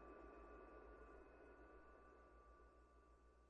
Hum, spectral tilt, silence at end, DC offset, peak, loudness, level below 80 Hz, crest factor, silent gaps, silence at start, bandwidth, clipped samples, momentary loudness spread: 60 Hz at -75 dBFS; -6 dB/octave; 0 s; under 0.1%; -50 dBFS; -65 LUFS; -70 dBFS; 14 dB; none; 0 s; 7.2 kHz; under 0.1%; 7 LU